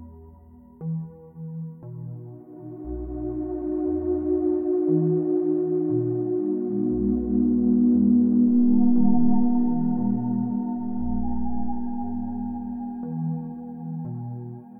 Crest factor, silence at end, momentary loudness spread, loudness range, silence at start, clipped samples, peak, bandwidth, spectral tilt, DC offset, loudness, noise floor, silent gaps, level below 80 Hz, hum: 16 dB; 0 s; 18 LU; 11 LU; 0 s; under 0.1%; -8 dBFS; 1.9 kHz; -15 dB/octave; under 0.1%; -24 LUFS; -48 dBFS; none; -44 dBFS; 60 Hz at -45 dBFS